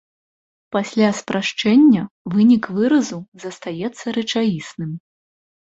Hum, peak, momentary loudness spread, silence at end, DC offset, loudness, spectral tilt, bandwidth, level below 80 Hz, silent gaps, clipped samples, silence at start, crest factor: none; -4 dBFS; 16 LU; 0.65 s; under 0.1%; -18 LUFS; -5.5 dB/octave; 8 kHz; -60 dBFS; 2.11-2.25 s, 3.28-3.32 s; under 0.1%; 0.7 s; 16 dB